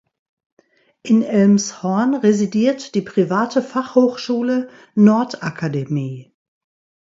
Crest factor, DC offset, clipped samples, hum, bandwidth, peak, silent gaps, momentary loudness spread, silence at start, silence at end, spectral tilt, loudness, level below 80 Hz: 16 dB; under 0.1%; under 0.1%; none; 7.8 kHz; -2 dBFS; none; 10 LU; 1.05 s; 0.8 s; -6.5 dB/octave; -18 LUFS; -64 dBFS